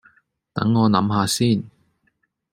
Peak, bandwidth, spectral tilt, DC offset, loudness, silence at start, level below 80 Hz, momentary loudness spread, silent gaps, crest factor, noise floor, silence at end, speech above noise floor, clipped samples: -2 dBFS; 16 kHz; -5.5 dB/octave; under 0.1%; -20 LUFS; 0.55 s; -58 dBFS; 12 LU; none; 20 dB; -69 dBFS; 0.85 s; 50 dB; under 0.1%